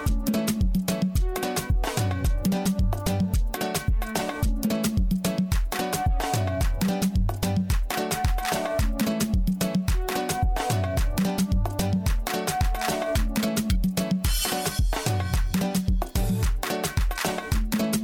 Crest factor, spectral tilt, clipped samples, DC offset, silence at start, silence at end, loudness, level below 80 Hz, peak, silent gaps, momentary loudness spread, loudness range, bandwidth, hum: 14 dB; -5 dB/octave; under 0.1%; under 0.1%; 0 s; 0 s; -26 LUFS; -28 dBFS; -10 dBFS; none; 2 LU; 1 LU; 17.5 kHz; none